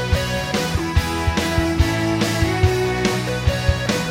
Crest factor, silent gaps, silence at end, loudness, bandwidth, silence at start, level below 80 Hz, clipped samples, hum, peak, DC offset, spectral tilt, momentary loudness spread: 16 dB; none; 0 s; -20 LUFS; 16 kHz; 0 s; -26 dBFS; under 0.1%; none; -4 dBFS; under 0.1%; -5 dB/octave; 3 LU